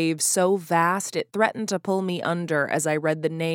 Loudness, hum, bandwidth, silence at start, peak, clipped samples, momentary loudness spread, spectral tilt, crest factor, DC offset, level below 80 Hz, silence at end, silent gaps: -24 LUFS; none; 17.5 kHz; 0 s; -6 dBFS; under 0.1%; 5 LU; -4 dB/octave; 18 dB; under 0.1%; -74 dBFS; 0 s; none